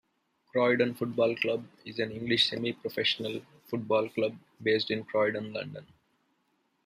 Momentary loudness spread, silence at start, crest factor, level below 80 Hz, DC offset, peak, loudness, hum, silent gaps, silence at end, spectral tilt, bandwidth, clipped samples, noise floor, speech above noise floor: 12 LU; 0.55 s; 20 dB; -72 dBFS; under 0.1%; -10 dBFS; -30 LUFS; none; none; 1 s; -5.5 dB/octave; 15 kHz; under 0.1%; -74 dBFS; 44 dB